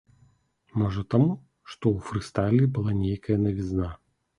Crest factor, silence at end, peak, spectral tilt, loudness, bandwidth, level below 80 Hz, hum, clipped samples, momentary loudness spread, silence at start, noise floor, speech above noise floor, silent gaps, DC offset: 18 dB; 0.45 s; -8 dBFS; -8.5 dB/octave; -26 LUFS; 11 kHz; -46 dBFS; none; under 0.1%; 10 LU; 0.75 s; -63 dBFS; 38 dB; none; under 0.1%